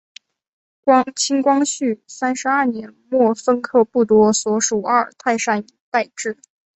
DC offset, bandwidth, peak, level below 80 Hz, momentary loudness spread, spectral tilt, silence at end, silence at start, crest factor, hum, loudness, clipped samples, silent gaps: under 0.1%; 8.4 kHz; -2 dBFS; -62 dBFS; 9 LU; -3.5 dB/octave; 0.4 s; 0.85 s; 16 dB; none; -18 LUFS; under 0.1%; 5.80-5.92 s